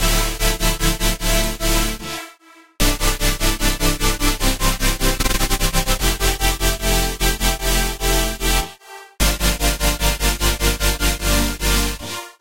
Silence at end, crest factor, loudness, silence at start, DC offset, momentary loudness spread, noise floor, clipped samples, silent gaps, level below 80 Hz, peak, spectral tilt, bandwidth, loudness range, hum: 0 s; 16 dB; -19 LUFS; 0 s; 2%; 3 LU; -47 dBFS; under 0.1%; none; -22 dBFS; -2 dBFS; -3 dB/octave; 16 kHz; 1 LU; none